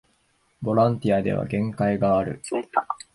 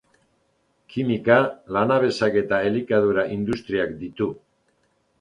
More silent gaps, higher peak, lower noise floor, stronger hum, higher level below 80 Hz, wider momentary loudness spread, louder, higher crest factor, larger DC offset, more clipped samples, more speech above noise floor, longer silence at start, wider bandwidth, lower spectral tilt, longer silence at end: neither; about the same, -6 dBFS vs -4 dBFS; about the same, -66 dBFS vs -67 dBFS; neither; about the same, -52 dBFS vs -56 dBFS; second, 7 LU vs 10 LU; about the same, -24 LUFS vs -22 LUFS; about the same, 18 dB vs 20 dB; neither; neither; about the same, 43 dB vs 46 dB; second, 0.6 s vs 0.9 s; first, 11.5 kHz vs 10 kHz; about the same, -7.5 dB/octave vs -7 dB/octave; second, 0.2 s vs 0.85 s